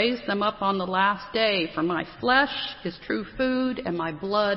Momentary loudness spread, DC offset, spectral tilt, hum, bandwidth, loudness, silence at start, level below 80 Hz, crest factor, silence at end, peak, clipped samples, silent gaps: 9 LU; under 0.1%; -9 dB/octave; none; 5.8 kHz; -25 LUFS; 0 s; -54 dBFS; 18 dB; 0 s; -8 dBFS; under 0.1%; none